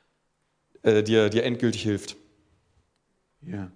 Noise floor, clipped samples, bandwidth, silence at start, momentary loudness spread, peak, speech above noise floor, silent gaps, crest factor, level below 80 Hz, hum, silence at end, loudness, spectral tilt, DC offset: -73 dBFS; under 0.1%; 10.5 kHz; 0.85 s; 17 LU; -8 dBFS; 50 dB; none; 20 dB; -66 dBFS; none; 0.05 s; -24 LUFS; -5.5 dB/octave; under 0.1%